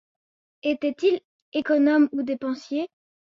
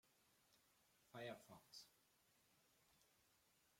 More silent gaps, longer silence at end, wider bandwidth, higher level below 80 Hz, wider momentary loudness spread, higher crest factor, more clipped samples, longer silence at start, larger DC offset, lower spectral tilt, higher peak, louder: first, 1.25-1.52 s vs none; first, 0.35 s vs 0 s; second, 7.2 kHz vs 16.5 kHz; first, -72 dBFS vs under -90 dBFS; first, 11 LU vs 7 LU; second, 14 dB vs 24 dB; neither; first, 0.65 s vs 0.05 s; neither; about the same, -5 dB/octave vs -4 dB/octave; first, -10 dBFS vs -42 dBFS; first, -24 LUFS vs -59 LUFS